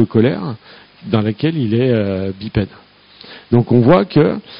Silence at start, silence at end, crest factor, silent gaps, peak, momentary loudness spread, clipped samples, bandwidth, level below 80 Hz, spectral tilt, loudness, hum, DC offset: 0 s; 0 s; 16 dB; none; 0 dBFS; 18 LU; under 0.1%; 5.4 kHz; -44 dBFS; -7 dB/octave; -15 LUFS; none; under 0.1%